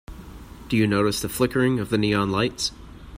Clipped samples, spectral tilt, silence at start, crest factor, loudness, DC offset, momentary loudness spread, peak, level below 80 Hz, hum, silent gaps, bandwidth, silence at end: under 0.1%; -5 dB/octave; 0.1 s; 18 dB; -23 LUFS; under 0.1%; 21 LU; -6 dBFS; -44 dBFS; none; none; 16 kHz; 0 s